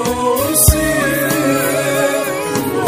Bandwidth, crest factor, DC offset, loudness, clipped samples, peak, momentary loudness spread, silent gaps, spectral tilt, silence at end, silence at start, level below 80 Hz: 16 kHz; 14 dB; under 0.1%; -14 LUFS; 0.1%; 0 dBFS; 7 LU; none; -4 dB/octave; 0 s; 0 s; -26 dBFS